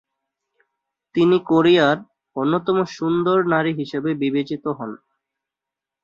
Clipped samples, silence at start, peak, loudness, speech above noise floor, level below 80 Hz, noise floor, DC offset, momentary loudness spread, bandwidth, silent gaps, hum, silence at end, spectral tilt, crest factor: under 0.1%; 1.15 s; -4 dBFS; -20 LUFS; 68 dB; -62 dBFS; -87 dBFS; under 0.1%; 12 LU; 7.2 kHz; none; 50 Hz at -55 dBFS; 1.1 s; -7 dB/octave; 18 dB